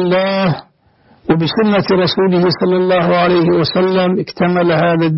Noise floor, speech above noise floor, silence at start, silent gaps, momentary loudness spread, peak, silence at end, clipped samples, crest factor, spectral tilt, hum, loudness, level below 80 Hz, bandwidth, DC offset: -51 dBFS; 38 dB; 0 s; none; 5 LU; -4 dBFS; 0 s; under 0.1%; 10 dB; -9 dB/octave; none; -13 LUFS; -46 dBFS; 6 kHz; under 0.1%